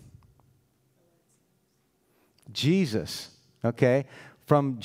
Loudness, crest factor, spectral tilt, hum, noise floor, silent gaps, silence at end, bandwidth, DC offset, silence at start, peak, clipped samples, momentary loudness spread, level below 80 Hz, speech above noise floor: -27 LUFS; 24 dB; -6.5 dB/octave; none; -71 dBFS; none; 0 s; 16 kHz; under 0.1%; 2.5 s; -6 dBFS; under 0.1%; 18 LU; -64 dBFS; 45 dB